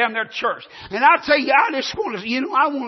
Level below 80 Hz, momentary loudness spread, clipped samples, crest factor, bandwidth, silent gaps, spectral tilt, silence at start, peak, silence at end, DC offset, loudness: -58 dBFS; 10 LU; under 0.1%; 16 dB; 6.2 kHz; none; -3.5 dB/octave; 0 s; -2 dBFS; 0 s; under 0.1%; -18 LUFS